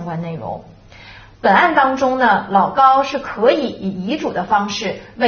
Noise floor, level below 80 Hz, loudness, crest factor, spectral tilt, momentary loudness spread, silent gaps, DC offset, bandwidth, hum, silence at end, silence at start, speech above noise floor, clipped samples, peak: -40 dBFS; -50 dBFS; -16 LUFS; 16 dB; -3 dB/octave; 13 LU; none; under 0.1%; 6.8 kHz; none; 0 s; 0 s; 24 dB; under 0.1%; 0 dBFS